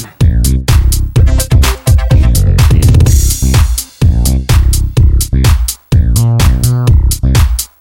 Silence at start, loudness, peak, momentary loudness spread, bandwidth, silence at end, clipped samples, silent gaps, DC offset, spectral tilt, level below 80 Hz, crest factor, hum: 0 s; -10 LUFS; 0 dBFS; 4 LU; 17 kHz; 0.15 s; 0.6%; none; under 0.1%; -5 dB/octave; -10 dBFS; 8 dB; none